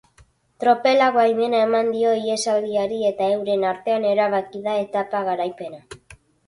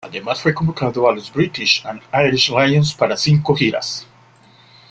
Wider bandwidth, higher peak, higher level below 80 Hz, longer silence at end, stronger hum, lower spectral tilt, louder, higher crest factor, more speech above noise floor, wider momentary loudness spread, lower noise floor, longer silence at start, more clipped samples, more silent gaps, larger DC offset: first, 11.5 kHz vs 8.6 kHz; second, -4 dBFS vs 0 dBFS; second, -64 dBFS vs -50 dBFS; second, 0.35 s vs 0.9 s; neither; about the same, -4 dB/octave vs -5 dB/octave; second, -20 LUFS vs -17 LUFS; about the same, 16 dB vs 16 dB; first, 36 dB vs 32 dB; about the same, 8 LU vs 8 LU; first, -56 dBFS vs -49 dBFS; first, 0.6 s vs 0.05 s; neither; neither; neither